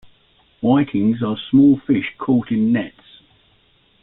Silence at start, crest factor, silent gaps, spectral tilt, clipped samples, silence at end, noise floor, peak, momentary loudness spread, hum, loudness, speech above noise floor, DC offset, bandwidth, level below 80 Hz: 0.6 s; 14 dB; none; -11.5 dB/octave; under 0.1%; 1.15 s; -57 dBFS; -4 dBFS; 9 LU; none; -18 LUFS; 41 dB; under 0.1%; 4 kHz; -54 dBFS